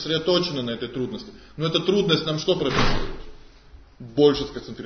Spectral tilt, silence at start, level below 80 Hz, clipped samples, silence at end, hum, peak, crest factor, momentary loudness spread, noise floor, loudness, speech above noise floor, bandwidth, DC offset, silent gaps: -5.5 dB/octave; 0 s; -36 dBFS; under 0.1%; 0 s; none; -4 dBFS; 18 dB; 14 LU; -48 dBFS; -23 LUFS; 25 dB; 6.6 kHz; under 0.1%; none